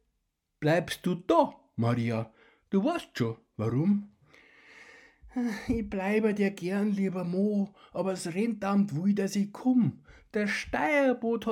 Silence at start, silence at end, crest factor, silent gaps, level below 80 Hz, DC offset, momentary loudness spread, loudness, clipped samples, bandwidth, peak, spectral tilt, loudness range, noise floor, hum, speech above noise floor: 0.6 s; 0 s; 20 dB; none; -56 dBFS; under 0.1%; 8 LU; -29 LUFS; under 0.1%; 15 kHz; -10 dBFS; -6.5 dB/octave; 4 LU; -80 dBFS; none; 51 dB